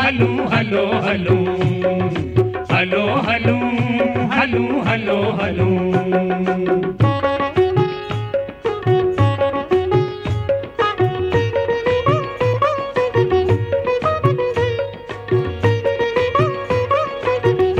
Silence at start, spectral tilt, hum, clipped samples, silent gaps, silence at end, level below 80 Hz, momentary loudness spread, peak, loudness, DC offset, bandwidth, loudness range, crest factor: 0 s; -8 dB/octave; none; under 0.1%; none; 0 s; -42 dBFS; 4 LU; -2 dBFS; -18 LUFS; under 0.1%; 8.2 kHz; 1 LU; 16 dB